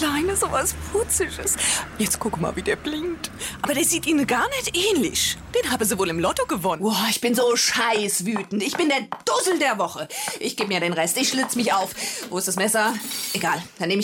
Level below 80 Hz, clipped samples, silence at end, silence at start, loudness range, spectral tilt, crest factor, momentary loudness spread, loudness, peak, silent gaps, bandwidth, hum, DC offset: -46 dBFS; under 0.1%; 0 s; 0 s; 2 LU; -2.5 dB/octave; 14 dB; 7 LU; -22 LUFS; -10 dBFS; none; 17 kHz; none; under 0.1%